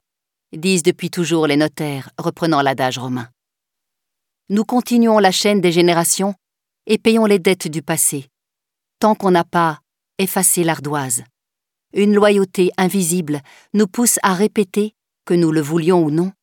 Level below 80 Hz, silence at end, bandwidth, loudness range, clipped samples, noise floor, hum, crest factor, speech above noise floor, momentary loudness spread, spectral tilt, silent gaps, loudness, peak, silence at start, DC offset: -66 dBFS; 0.1 s; 18.5 kHz; 4 LU; under 0.1%; -83 dBFS; none; 16 dB; 67 dB; 11 LU; -4.5 dB/octave; none; -16 LUFS; -2 dBFS; 0.55 s; under 0.1%